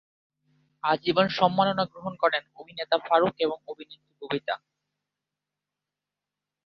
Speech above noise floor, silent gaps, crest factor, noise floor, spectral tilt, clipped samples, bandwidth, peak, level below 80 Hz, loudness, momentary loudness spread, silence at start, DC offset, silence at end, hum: 62 dB; none; 22 dB; -88 dBFS; -6.5 dB/octave; under 0.1%; 6.6 kHz; -6 dBFS; -70 dBFS; -26 LUFS; 19 LU; 0.85 s; under 0.1%; 2.1 s; 50 Hz at -60 dBFS